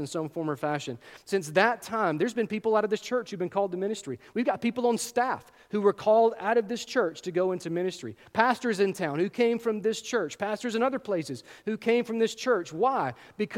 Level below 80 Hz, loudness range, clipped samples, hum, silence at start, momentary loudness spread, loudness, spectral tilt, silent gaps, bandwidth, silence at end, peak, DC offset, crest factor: -72 dBFS; 2 LU; under 0.1%; none; 0 s; 9 LU; -28 LUFS; -5 dB/octave; none; 16.5 kHz; 0 s; -6 dBFS; under 0.1%; 22 dB